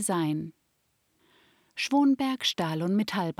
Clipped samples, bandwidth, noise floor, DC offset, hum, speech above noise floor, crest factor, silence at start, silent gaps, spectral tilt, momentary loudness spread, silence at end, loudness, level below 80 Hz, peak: under 0.1%; 15.5 kHz; -73 dBFS; under 0.1%; none; 46 dB; 16 dB; 0 s; none; -4.5 dB/octave; 11 LU; 0.1 s; -27 LUFS; -72 dBFS; -12 dBFS